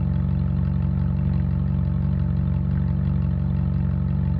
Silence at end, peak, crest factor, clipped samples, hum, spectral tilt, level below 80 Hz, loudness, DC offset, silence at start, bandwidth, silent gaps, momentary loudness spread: 0 s; -12 dBFS; 10 dB; under 0.1%; none; -12 dB/octave; -28 dBFS; -23 LUFS; under 0.1%; 0 s; 4.3 kHz; none; 0 LU